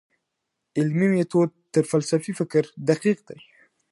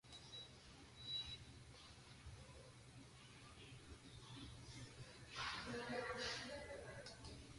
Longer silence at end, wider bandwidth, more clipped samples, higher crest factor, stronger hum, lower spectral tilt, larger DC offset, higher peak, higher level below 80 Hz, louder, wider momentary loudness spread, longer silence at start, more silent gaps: first, 0.55 s vs 0 s; about the same, 11.5 kHz vs 11.5 kHz; neither; about the same, 18 dB vs 20 dB; neither; first, -6.5 dB/octave vs -3.5 dB/octave; neither; first, -6 dBFS vs -34 dBFS; about the same, -72 dBFS vs -68 dBFS; first, -23 LUFS vs -52 LUFS; second, 5 LU vs 15 LU; first, 0.75 s vs 0.05 s; neither